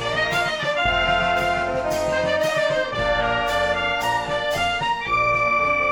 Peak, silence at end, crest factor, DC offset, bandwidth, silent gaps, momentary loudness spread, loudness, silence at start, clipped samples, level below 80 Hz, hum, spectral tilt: -10 dBFS; 0 s; 12 dB; under 0.1%; 17.5 kHz; none; 4 LU; -21 LUFS; 0 s; under 0.1%; -40 dBFS; none; -3.5 dB/octave